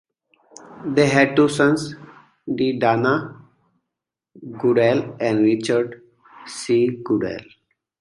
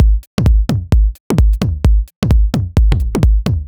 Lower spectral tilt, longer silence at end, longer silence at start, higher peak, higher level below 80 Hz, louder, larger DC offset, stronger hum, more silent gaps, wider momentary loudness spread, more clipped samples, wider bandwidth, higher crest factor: second, -6 dB/octave vs -7.5 dB/octave; first, 0.6 s vs 0 s; first, 0.7 s vs 0 s; about the same, -2 dBFS vs 0 dBFS; second, -60 dBFS vs -14 dBFS; second, -19 LUFS vs -15 LUFS; neither; neither; second, none vs 0.27-0.38 s, 1.20-1.30 s, 2.16-2.22 s; first, 19 LU vs 2 LU; neither; about the same, 11.5 kHz vs 11.5 kHz; first, 20 dB vs 12 dB